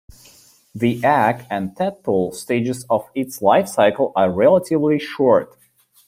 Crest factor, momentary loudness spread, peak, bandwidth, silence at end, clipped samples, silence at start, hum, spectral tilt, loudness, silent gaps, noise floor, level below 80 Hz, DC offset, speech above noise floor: 16 dB; 9 LU; -2 dBFS; 16 kHz; 0.65 s; under 0.1%; 0.75 s; none; -6 dB/octave; -18 LUFS; none; -50 dBFS; -58 dBFS; under 0.1%; 32 dB